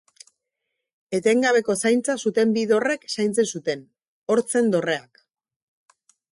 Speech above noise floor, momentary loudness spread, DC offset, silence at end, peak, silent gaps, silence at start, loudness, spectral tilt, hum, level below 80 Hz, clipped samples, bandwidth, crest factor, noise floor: 60 dB; 10 LU; under 0.1%; 1.3 s; -8 dBFS; 4.08-4.22 s; 1.1 s; -22 LUFS; -4 dB/octave; none; -70 dBFS; under 0.1%; 11.5 kHz; 16 dB; -81 dBFS